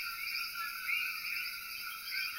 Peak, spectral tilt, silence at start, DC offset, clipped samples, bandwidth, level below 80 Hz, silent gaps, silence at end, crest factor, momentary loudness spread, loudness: -22 dBFS; 2.5 dB/octave; 0 s; under 0.1%; under 0.1%; 16 kHz; -72 dBFS; none; 0 s; 16 dB; 6 LU; -36 LUFS